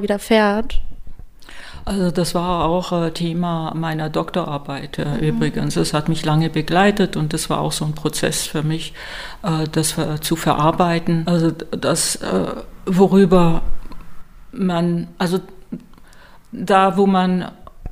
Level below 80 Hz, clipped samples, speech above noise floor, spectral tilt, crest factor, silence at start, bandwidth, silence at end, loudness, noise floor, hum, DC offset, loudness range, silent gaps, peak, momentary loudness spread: -34 dBFS; under 0.1%; 25 dB; -5.5 dB/octave; 18 dB; 0 s; 16 kHz; 0 s; -19 LUFS; -42 dBFS; none; under 0.1%; 4 LU; none; -2 dBFS; 15 LU